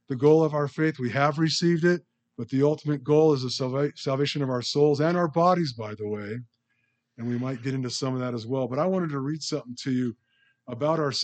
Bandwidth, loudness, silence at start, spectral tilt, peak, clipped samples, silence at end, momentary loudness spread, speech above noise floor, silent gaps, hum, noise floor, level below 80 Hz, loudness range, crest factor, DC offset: 9 kHz; -25 LUFS; 0.1 s; -6 dB/octave; -8 dBFS; under 0.1%; 0 s; 11 LU; 49 dB; none; none; -74 dBFS; -74 dBFS; 6 LU; 18 dB; under 0.1%